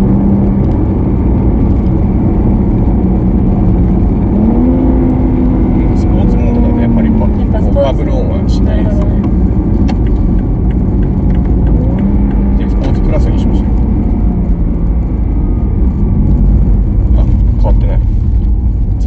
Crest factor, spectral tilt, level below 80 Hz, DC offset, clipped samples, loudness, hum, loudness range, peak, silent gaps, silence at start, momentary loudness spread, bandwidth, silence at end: 8 dB; -10.5 dB/octave; -12 dBFS; under 0.1%; under 0.1%; -12 LUFS; none; 2 LU; 0 dBFS; none; 0 s; 3 LU; 4.6 kHz; 0 s